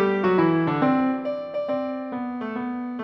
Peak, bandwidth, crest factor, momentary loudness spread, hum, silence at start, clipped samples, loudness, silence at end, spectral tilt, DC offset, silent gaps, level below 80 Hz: -8 dBFS; 5.8 kHz; 16 dB; 10 LU; none; 0 s; under 0.1%; -24 LUFS; 0 s; -9.5 dB/octave; under 0.1%; none; -64 dBFS